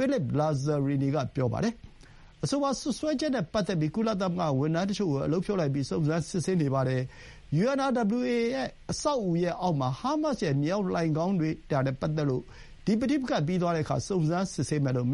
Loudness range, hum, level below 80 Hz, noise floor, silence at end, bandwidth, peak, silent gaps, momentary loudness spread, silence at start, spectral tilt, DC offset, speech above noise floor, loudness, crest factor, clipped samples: 1 LU; none; -54 dBFS; -52 dBFS; 0 s; 11.5 kHz; -14 dBFS; none; 3 LU; 0 s; -6.5 dB/octave; under 0.1%; 24 dB; -29 LUFS; 14 dB; under 0.1%